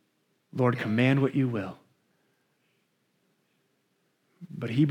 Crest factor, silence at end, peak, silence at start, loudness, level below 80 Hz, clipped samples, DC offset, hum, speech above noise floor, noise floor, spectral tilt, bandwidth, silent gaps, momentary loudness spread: 18 dB; 0 s; -12 dBFS; 0.55 s; -27 LUFS; -76 dBFS; under 0.1%; under 0.1%; none; 48 dB; -73 dBFS; -8.5 dB/octave; 9.6 kHz; none; 17 LU